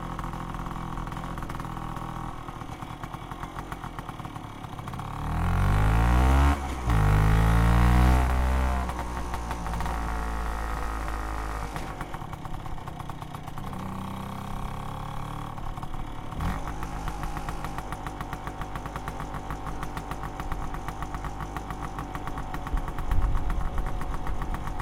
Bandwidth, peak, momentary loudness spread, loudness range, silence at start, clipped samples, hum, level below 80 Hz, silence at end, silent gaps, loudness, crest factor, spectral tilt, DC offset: 16 kHz; -10 dBFS; 15 LU; 13 LU; 0 s; under 0.1%; none; -30 dBFS; 0 s; none; -31 LUFS; 18 dB; -6.5 dB/octave; under 0.1%